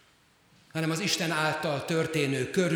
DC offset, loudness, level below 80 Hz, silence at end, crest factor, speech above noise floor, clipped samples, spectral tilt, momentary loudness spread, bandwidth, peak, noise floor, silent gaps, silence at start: under 0.1%; -28 LUFS; -68 dBFS; 0 s; 16 dB; 35 dB; under 0.1%; -4.5 dB/octave; 4 LU; 19.5 kHz; -12 dBFS; -63 dBFS; none; 0.75 s